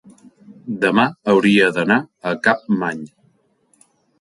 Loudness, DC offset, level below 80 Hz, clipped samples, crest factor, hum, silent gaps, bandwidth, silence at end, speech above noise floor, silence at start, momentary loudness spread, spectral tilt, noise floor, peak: -17 LUFS; under 0.1%; -62 dBFS; under 0.1%; 18 dB; none; none; 11.5 kHz; 1.15 s; 44 dB; 0.65 s; 17 LU; -6 dB/octave; -61 dBFS; 0 dBFS